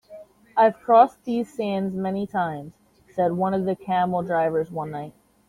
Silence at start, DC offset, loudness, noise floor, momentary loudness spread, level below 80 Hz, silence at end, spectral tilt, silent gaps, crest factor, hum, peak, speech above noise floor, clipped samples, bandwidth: 0.1 s; under 0.1%; -23 LUFS; -46 dBFS; 15 LU; -62 dBFS; 0.4 s; -8 dB/octave; none; 20 dB; none; -4 dBFS; 24 dB; under 0.1%; 11.5 kHz